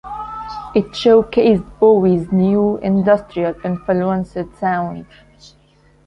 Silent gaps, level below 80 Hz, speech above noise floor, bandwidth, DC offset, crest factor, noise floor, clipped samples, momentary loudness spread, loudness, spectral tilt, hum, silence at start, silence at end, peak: none; -44 dBFS; 37 dB; 7.2 kHz; under 0.1%; 16 dB; -52 dBFS; under 0.1%; 14 LU; -16 LUFS; -8 dB/octave; 50 Hz at -45 dBFS; 0.05 s; 1.05 s; -2 dBFS